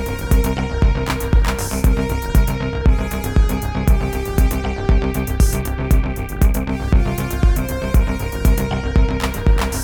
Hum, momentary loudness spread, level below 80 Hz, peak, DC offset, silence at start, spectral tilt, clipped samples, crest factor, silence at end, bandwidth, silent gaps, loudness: none; 3 LU; -18 dBFS; -2 dBFS; under 0.1%; 0 s; -6 dB/octave; under 0.1%; 14 dB; 0 s; over 20 kHz; none; -19 LUFS